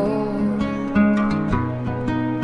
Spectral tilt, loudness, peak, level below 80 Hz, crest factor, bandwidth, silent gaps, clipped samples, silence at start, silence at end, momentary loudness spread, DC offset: -8.5 dB/octave; -21 LUFS; -6 dBFS; -38 dBFS; 14 dB; 7.2 kHz; none; under 0.1%; 0 s; 0 s; 6 LU; under 0.1%